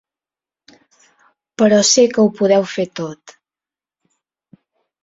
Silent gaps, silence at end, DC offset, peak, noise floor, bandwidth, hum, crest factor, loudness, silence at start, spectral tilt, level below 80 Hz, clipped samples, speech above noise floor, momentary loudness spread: none; 1.7 s; under 0.1%; -2 dBFS; under -90 dBFS; 7.8 kHz; none; 18 dB; -14 LUFS; 1.6 s; -3.5 dB/octave; -62 dBFS; under 0.1%; over 76 dB; 17 LU